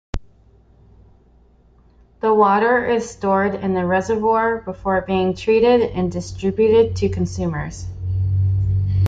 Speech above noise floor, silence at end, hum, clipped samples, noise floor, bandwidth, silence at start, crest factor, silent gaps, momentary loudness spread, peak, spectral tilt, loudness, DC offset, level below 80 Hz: 34 dB; 0 s; none; under 0.1%; -52 dBFS; 7.8 kHz; 0.15 s; 16 dB; none; 10 LU; -2 dBFS; -7 dB/octave; -19 LUFS; under 0.1%; -38 dBFS